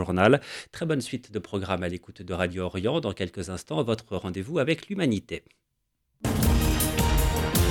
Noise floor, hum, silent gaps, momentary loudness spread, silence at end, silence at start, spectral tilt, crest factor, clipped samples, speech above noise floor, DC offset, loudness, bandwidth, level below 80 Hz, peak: -77 dBFS; none; none; 11 LU; 0 s; 0 s; -5 dB/octave; 22 dB; under 0.1%; 50 dB; under 0.1%; -27 LUFS; 18 kHz; -34 dBFS; -4 dBFS